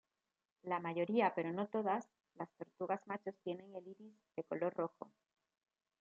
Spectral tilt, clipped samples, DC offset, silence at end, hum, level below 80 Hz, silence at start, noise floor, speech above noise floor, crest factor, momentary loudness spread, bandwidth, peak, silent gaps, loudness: -5 dB/octave; under 0.1%; under 0.1%; 0.95 s; none; under -90 dBFS; 0.65 s; under -90 dBFS; over 49 dB; 20 dB; 18 LU; 7.4 kHz; -22 dBFS; none; -41 LUFS